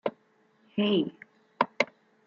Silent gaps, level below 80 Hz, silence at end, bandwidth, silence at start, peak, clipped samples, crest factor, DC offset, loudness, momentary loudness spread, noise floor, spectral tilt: none; -76 dBFS; 0.4 s; 7.2 kHz; 0.05 s; -6 dBFS; under 0.1%; 24 dB; under 0.1%; -30 LUFS; 10 LU; -66 dBFS; -3.5 dB/octave